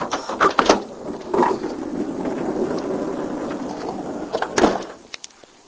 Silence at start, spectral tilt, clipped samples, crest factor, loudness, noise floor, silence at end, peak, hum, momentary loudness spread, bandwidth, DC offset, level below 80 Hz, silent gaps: 0 s; -4 dB/octave; under 0.1%; 22 dB; -23 LUFS; -44 dBFS; 0.5 s; 0 dBFS; none; 14 LU; 8 kHz; under 0.1%; -50 dBFS; none